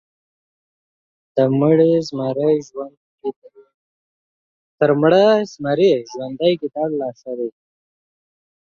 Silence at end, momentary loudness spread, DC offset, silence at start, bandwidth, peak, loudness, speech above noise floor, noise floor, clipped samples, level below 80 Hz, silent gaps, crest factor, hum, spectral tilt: 1.15 s; 16 LU; under 0.1%; 1.35 s; 7.4 kHz; -2 dBFS; -18 LUFS; over 73 dB; under -90 dBFS; under 0.1%; -66 dBFS; 2.97-3.18 s, 3.36-3.42 s, 3.74-4.78 s; 18 dB; none; -7 dB/octave